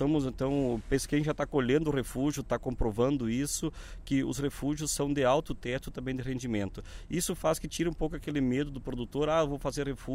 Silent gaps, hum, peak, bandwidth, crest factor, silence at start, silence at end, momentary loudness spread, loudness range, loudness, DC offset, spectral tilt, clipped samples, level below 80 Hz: none; none; -14 dBFS; 16 kHz; 16 dB; 0 s; 0 s; 8 LU; 3 LU; -31 LUFS; under 0.1%; -5.5 dB/octave; under 0.1%; -44 dBFS